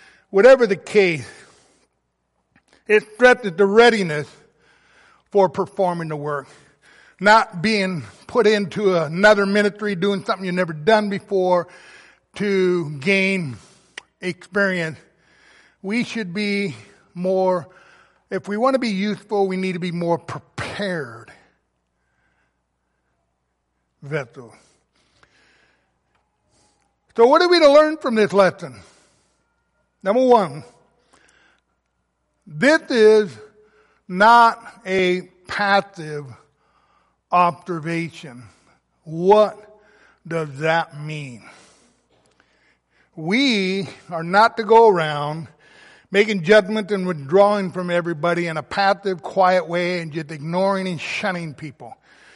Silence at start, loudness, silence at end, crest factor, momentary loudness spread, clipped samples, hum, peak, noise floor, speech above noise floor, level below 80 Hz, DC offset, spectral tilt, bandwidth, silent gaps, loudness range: 0.35 s; -18 LUFS; 0.45 s; 18 dB; 17 LU; under 0.1%; none; -2 dBFS; -72 dBFS; 54 dB; -62 dBFS; under 0.1%; -5.5 dB/octave; 11.5 kHz; none; 11 LU